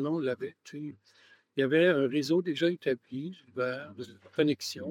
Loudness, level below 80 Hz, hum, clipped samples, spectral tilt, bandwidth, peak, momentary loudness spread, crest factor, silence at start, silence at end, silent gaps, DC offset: -30 LUFS; -86 dBFS; none; under 0.1%; -5.5 dB/octave; 17 kHz; -12 dBFS; 17 LU; 18 dB; 0 s; 0 s; none; under 0.1%